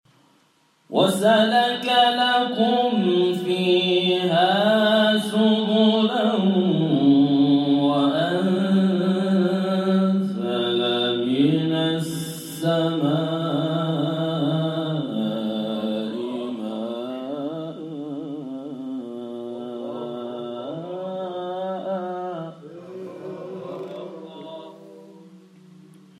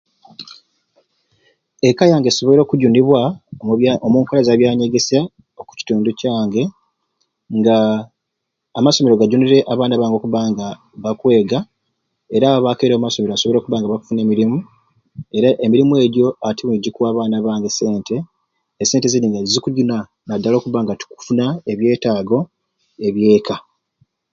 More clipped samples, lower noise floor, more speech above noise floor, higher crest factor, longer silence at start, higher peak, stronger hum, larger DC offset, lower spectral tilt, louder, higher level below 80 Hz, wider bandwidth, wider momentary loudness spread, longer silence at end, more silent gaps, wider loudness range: neither; second, -62 dBFS vs -77 dBFS; second, 43 dB vs 62 dB; about the same, 16 dB vs 16 dB; first, 0.9 s vs 0.4 s; second, -6 dBFS vs 0 dBFS; neither; neither; about the same, -6 dB/octave vs -5.5 dB/octave; second, -22 LUFS vs -16 LUFS; second, -72 dBFS vs -56 dBFS; first, 14.5 kHz vs 7.6 kHz; first, 16 LU vs 12 LU; about the same, 0.8 s vs 0.7 s; neither; first, 13 LU vs 4 LU